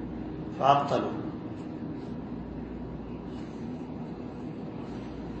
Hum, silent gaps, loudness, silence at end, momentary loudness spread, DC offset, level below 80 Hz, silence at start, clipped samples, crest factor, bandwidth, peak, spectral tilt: none; none; -33 LUFS; 0 s; 14 LU; under 0.1%; -50 dBFS; 0 s; under 0.1%; 26 dB; 8.2 kHz; -6 dBFS; -7.5 dB/octave